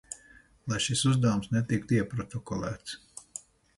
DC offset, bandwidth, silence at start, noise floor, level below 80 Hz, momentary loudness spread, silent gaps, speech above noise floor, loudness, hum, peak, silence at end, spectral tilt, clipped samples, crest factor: under 0.1%; 11.5 kHz; 0.1 s; -58 dBFS; -56 dBFS; 19 LU; none; 29 dB; -29 LUFS; none; -14 dBFS; 0.4 s; -5 dB/octave; under 0.1%; 16 dB